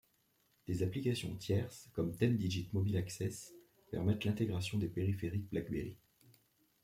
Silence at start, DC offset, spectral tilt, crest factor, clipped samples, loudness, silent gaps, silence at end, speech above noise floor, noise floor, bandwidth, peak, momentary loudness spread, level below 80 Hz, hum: 0.7 s; under 0.1%; -6.5 dB/octave; 20 dB; under 0.1%; -38 LUFS; none; 0.85 s; 39 dB; -76 dBFS; 16 kHz; -18 dBFS; 9 LU; -64 dBFS; none